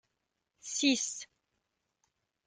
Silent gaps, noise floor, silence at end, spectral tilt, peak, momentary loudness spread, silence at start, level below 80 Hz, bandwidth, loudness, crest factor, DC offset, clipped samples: none; -84 dBFS; 1.2 s; -0.5 dB/octave; -14 dBFS; 20 LU; 0.65 s; -82 dBFS; 10 kHz; -31 LUFS; 24 dB; under 0.1%; under 0.1%